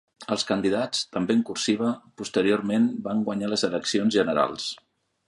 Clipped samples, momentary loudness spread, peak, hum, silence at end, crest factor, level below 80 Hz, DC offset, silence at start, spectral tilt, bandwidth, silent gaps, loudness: under 0.1%; 7 LU; -8 dBFS; none; 0.5 s; 18 dB; -64 dBFS; under 0.1%; 0.2 s; -4.5 dB/octave; 11.5 kHz; none; -25 LUFS